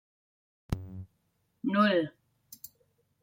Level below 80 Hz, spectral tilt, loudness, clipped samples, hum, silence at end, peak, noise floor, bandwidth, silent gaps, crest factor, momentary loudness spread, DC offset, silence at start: -52 dBFS; -6.5 dB/octave; -30 LUFS; under 0.1%; none; 0.65 s; -14 dBFS; -75 dBFS; 16.5 kHz; none; 20 dB; 23 LU; under 0.1%; 0.7 s